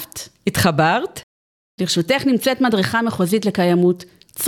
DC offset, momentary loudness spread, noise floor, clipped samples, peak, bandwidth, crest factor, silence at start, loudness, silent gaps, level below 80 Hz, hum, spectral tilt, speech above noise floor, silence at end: under 0.1%; 13 LU; under -90 dBFS; under 0.1%; -2 dBFS; 18.5 kHz; 16 dB; 0 s; -18 LUFS; 1.23-1.78 s; -52 dBFS; none; -5 dB/octave; over 73 dB; 0 s